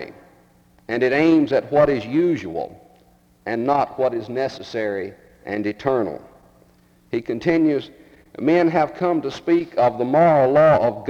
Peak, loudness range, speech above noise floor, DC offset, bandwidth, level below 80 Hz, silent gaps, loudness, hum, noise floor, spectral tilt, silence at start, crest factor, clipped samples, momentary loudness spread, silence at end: -4 dBFS; 6 LU; 36 dB; under 0.1%; 7.4 kHz; -54 dBFS; none; -20 LUFS; none; -55 dBFS; -7.5 dB/octave; 0 s; 16 dB; under 0.1%; 14 LU; 0 s